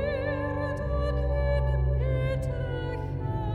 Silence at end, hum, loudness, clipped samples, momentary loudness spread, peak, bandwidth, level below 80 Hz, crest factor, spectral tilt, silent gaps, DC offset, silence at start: 0 s; none; -29 LUFS; under 0.1%; 5 LU; -16 dBFS; 4.7 kHz; -32 dBFS; 12 dB; -8.5 dB/octave; none; under 0.1%; 0 s